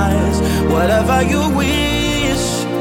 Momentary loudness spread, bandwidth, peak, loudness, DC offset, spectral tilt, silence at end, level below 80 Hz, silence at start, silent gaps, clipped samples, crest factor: 3 LU; 17 kHz; -2 dBFS; -15 LUFS; under 0.1%; -5 dB/octave; 0 s; -24 dBFS; 0 s; none; under 0.1%; 12 dB